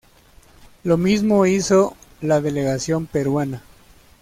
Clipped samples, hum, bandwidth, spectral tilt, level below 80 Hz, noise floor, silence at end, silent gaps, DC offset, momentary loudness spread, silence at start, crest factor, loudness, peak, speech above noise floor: under 0.1%; none; 16 kHz; -6 dB/octave; -50 dBFS; -50 dBFS; 0.65 s; none; under 0.1%; 12 LU; 0.85 s; 14 dB; -19 LUFS; -6 dBFS; 32 dB